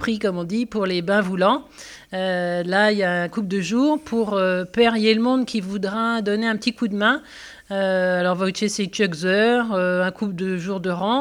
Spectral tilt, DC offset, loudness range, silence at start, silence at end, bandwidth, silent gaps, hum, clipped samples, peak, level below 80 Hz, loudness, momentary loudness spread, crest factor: -5 dB/octave; under 0.1%; 2 LU; 0 s; 0 s; 14 kHz; none; none; under 0.1%; -4 dBFS; -58 dBFS; -21 LUFS; 7 LU; 16 dB